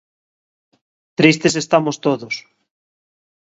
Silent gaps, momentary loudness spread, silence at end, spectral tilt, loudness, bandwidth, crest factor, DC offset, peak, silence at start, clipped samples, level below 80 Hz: none; 15 LU; 1 s; -4.5 dB/octave; -17 LUFS; 8 kHz; 20 dB; under 0.1%; 0 dBFS; 1.2 s; under 0.1%; -62 dBFS